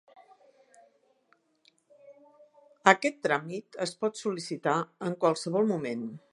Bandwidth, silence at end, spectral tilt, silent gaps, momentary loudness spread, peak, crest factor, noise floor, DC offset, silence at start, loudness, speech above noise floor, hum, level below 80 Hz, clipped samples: 11.5 kHz; 0.15 s; -4.5 dB/octave; none; 12 LU; -2 dBFS; 30 dB; -69 dBFS; under 0.1%; 2.05 s; -29 LUFS; 40 dB; none; -80 dBFS; under 0.1%